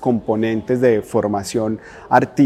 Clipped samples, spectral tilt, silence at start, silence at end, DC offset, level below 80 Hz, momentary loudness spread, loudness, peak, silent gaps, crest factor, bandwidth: under 0.1%; -6.5 dB/octave; 0 s; 0 s; under 0.1%; -52 dBFS; 6 LU; -19 LUFS; 0 dBFS; none; 18 dB; 14.5 kHz